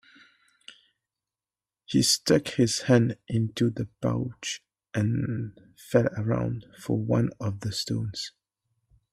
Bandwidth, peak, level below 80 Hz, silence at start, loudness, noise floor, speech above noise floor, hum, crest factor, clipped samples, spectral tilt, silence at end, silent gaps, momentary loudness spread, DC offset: 14.5 kHz; -8 dBFS; -58 dBFS; 1.9 s; -27 LUFS; under -90 dBFS; over 64 dB; none; 20 dB; under 0.1%; -5 dB/octave; 0.85 s; none; 12 LU; under 0.1%